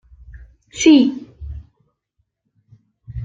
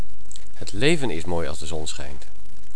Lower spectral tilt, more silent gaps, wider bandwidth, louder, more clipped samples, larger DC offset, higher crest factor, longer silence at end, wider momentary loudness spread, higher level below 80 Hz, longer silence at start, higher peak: about the same, -4.5 dB/octave vs -4.5 dB/octave; neither; second, 7.8 kHz vs 11 kHz; first, -14 LUFS vs -26 LUFS; neither; second, under 0.1% vs 20%; about the same, 18 dB vs 20 dB; about the same, 0 s vs 0 s; about the same, 24 LU vs 22 LU; about the same, -42 dBFS vs -42 dBFS; first, 0.35 s vs 0 s; about the same, -2 dBFS vs -4 dBFS